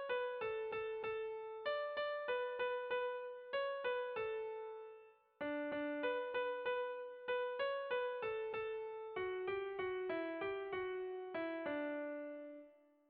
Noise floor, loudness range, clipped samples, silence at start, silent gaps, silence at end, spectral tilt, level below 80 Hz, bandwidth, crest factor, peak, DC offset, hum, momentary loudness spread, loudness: -64 dBFS; 2 LU; under 0.1%; 0 s; none; 0.35 s; -1.5 dB/octave; -78 dBFS; 4.9 kHz; 14 dB; -28 dBFS; under 0.1%; none; 7 LU; -42 LUFS